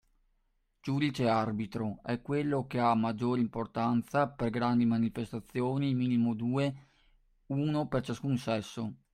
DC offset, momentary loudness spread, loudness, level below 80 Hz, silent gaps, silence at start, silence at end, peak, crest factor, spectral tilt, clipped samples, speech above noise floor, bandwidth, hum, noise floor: under 0.1%; 8 LU; -32 LUFS; -62 dBFS; none; 0.85 s; 0.2 s; -14 dBFS; 18 dB; -7.5 dB/octave; under 0.1%; 44 dB; 12 kHz; none; -75 dBFS